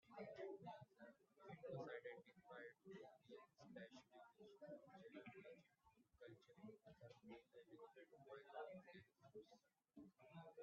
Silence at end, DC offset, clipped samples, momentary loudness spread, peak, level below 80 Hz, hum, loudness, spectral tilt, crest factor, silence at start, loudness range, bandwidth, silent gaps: 0 s; under 0.1%; under 0.1%; 12 LU; -44 dBFS; under -90 dBFS; none; -62 LUFS; -5 dB/octave; 18 dB; 0.05 s; 6 LU; 6.8 kHz; none